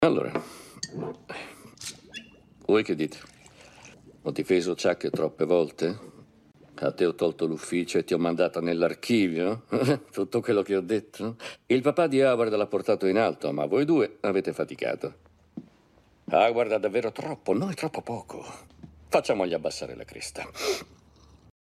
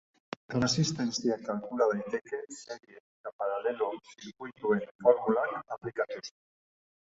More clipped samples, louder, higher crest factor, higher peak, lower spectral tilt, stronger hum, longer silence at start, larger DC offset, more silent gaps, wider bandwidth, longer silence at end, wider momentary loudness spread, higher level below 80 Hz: neither; first, -27 LUFS vs -31 LUFS; about the same, 20 dB vs 22 dB; about the same, -8 dBFS vs -10 dBFS; about the same, -5.5 dB/octave vs -5 dB/octave; neither; second, 0 s vs 0.5 s; neither; second, none vs 3.00-3.24 s, 3.33-3.39 s, 4.91-4.99 s; first, 14.5 kHz vs 8 kHz; first, 0.95 s vs 0.75 s; second, 16 LU vs 19 LU; about the same, -64 dBFS vs -68 dBFS